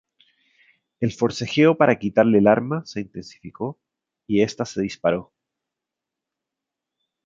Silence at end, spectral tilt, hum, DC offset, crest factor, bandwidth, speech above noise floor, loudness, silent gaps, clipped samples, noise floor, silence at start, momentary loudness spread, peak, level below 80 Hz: 2.05 s; -6.5 dB/octave; none; under 0.1%; 22 dB; 7.8 kHz; 65 dB; -21 LUFS; none; under 0.1%; -86 dBFS; 1 s; 16 LU; -2 dBFS; -58 dBFS